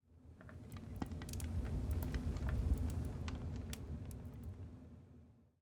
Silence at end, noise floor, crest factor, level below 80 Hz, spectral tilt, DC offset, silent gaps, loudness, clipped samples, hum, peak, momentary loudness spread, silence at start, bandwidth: 0.2 s; -63 dBFS; 18 dB; -46 dBFS; -6.5 dB/octave; under 0.1%; none; -44 LUFS; under 0.1%; none; -26 dBFS; 19 LU; 0.1 s; 19.5 kHz